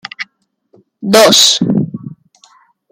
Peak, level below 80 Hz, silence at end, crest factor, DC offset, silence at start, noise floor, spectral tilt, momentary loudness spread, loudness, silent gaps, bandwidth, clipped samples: 0 dBFS; -56 dBFS; 0.8 s; 14 dB; under 0.1%; 0.2 s; -59 dBFS; -3 dB/octave; 21 LU; -8 LUFS; none; over 20 kHz; under 0.1%